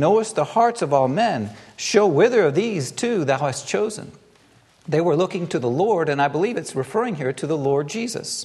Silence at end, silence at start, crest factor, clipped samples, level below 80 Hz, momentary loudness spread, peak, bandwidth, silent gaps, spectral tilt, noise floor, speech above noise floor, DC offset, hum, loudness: 0 s; 0 s; 18 dB; under 0.1%; -66 dBFS; 9 LU; -4 dBFS; 12.5 kHz; none; -5 dB/octave; -55 dBFS; 34 dB; under 0.1%; none; -21 LUFS